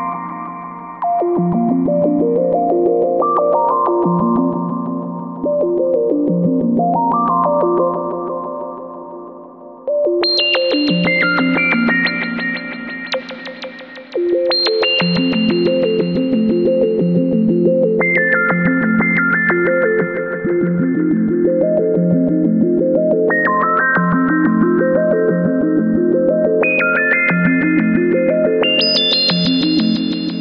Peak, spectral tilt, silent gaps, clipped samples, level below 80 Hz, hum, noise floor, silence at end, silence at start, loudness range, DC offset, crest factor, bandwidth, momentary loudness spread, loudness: -2 dBFS; -7.5 dB/octave; none; under 0.1%; -52 dBFS; none; -36 dBFS; 0 s; 0 s; 4 LU; under 0.1%; 14 dB; 6.6 kHz; 10 LU; -15 LUFS